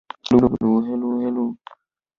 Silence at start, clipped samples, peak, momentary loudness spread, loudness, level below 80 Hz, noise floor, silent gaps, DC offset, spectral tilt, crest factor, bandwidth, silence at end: 0.25 s; under 0.1%; -2 dBFS; 10 LU; -20 LUFS; -48 dBFS; -54 dBFS; none; under 0.1%; -8 dB/octave; 18 dB; 7 kHz; 0.65 s